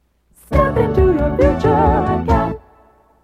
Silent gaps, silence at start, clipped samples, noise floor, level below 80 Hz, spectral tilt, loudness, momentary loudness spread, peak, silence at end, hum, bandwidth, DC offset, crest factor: none; 0.5 s; under 0.1%; -51 dBFS; -24 dBFS; -9 dB/octave; -16 LUFS; 5 LU; 0 dBFS; 0.65 s; none; 13 kHz; under 0.1%; 16 dB